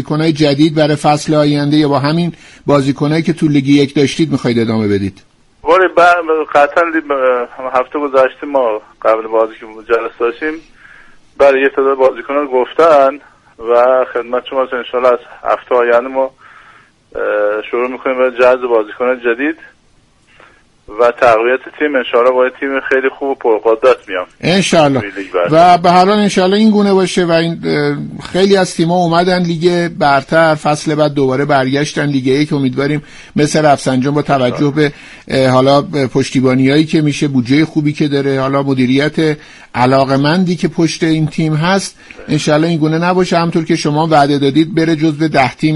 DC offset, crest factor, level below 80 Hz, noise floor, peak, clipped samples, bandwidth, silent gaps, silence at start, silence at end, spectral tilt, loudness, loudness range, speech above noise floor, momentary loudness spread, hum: under 0.1%; 12 dB; -46 dBFS; -50 dBFS; 0 dBFS; under 0.1%; 11.5 kHz; none; 0 s; 0 s; -6 dB/octave; -12 LUFS; 4 LU; 38 dB; 8 LU; none